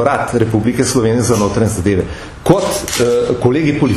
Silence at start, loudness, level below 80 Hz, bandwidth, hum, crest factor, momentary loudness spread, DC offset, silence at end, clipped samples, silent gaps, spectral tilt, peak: 0 s; -14 LUFS; -34 dBFS; 14 kHz; none; 14 dB; 3 LU; under 0.1%; 0 s; under 0.1%; none; -5.5 dB/octave; 0 dBFS